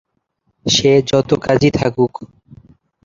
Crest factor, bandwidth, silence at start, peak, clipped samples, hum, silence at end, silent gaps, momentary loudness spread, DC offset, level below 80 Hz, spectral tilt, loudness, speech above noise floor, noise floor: 16 dB; 7.6 kHz; 0.65 s; -2 dBFS; under 0.1%; none; 0.8 s; none; 9 LU; under 0.1%; -44 dBFS; -5 dB/octave; -15 LUFS; 52 dB; -67 dBFS